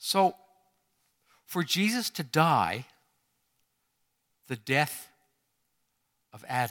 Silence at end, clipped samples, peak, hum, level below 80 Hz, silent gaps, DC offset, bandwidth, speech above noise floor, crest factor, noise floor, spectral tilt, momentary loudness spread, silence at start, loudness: 0 s; under 0.1%; -6 dBFS; none; -74 dBFS; none; under 0.1%; 19 kHz; 50 dB; 24 dB; -77 dBFS; -4 dB/octave; 15 LU; 0 s; -28 LUFS